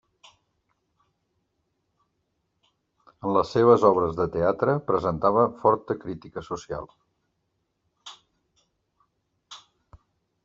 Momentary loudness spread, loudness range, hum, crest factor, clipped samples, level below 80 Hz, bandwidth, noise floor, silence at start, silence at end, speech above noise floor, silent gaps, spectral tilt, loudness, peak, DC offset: 18 LU; 18 LU; none; 24 dB; under 0.1%; -58 dBFS; 7.6 kHz; -76 dBFS; 3.25 s; 0.9 s; 53 dB; none; -6.5 dB/octave; -23 LUFS; -4 dBFS; under 0.1%